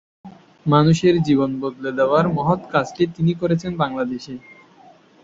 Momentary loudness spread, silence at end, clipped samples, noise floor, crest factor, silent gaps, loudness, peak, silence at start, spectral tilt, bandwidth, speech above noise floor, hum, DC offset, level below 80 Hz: 11 LU; 0.85 s; under 0.1%; -49 dBFS; 18 dB; none; -19 LUFS; -2 dBFS; 0.25 s; -7 dB/octave; 7.8 kHz; 31 dB; none; under 0.1%; -52 dBFS